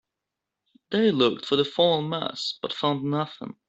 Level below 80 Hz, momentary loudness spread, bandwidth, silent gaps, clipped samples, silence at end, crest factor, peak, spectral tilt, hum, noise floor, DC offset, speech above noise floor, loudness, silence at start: -68 dBFS; 8 LU; 8.2 kHz; none; under 0.1%; 0.15 s; 20 dB; -6 dBFS; -6 dB/octave; none; -86 dBFS; under 0.1%; 61 dB; -25 LUFS; 0.9 s